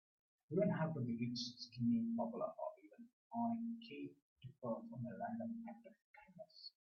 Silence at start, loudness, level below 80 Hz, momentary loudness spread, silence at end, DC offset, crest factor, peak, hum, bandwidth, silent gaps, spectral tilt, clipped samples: 0.5 s; -44 LUFS; -82 dBFS; 22 LU; 0.25 s; under 0.1%; 18 dB; -26 dBFS; none; 6.8 kHz; 3.13-3.30 s, 4.22-4.36 s, 6.04-6.14 s; -6 dB/octave; under 0.1%